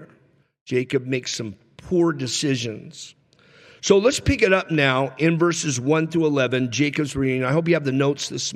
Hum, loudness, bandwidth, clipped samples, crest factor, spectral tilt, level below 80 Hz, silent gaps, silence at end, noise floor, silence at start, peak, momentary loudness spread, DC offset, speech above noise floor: none; -21 LUFS; 13.5 kHz; under 0.1%; 18 dB; -5 dB/octave; -48 dBFS; 0.61-0.66 s; 0 s; -58 dBFS; 0 s; -4 dBFS; 11 LU; under 0.1%; 37 dB